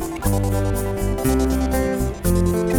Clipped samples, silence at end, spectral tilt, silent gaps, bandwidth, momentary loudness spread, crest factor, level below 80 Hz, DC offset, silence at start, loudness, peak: under 0.1%; 0 s; -6.5 dB/octave; none; 19.5 kHz; 4 LU; 14 dB; -26 dBFS; under 0.1%; 0 s; -21 LUFS; -4 dBFS